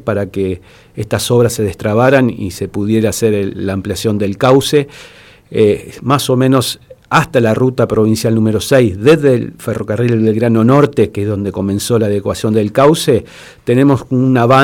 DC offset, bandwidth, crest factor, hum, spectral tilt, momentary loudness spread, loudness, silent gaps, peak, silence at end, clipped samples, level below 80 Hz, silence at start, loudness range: under 0.1%; 18 kHz; 12 dB; none; -6 dB/octave; 10 LU; -13 LUFS; none; 0 dBFS; 0 s; under 0.1%; -46 dBFS; 0.05 s; 2 LU